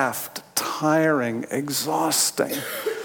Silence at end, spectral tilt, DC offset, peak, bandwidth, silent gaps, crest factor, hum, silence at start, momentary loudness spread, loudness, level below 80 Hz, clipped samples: 0 s; -3 dB/octave; under 0.1%; -6 dBFS; 18 kHz; none; 18 dB; none; 0 s; 8 LU; -23 LUFS; -72 dBFS; under 0.1%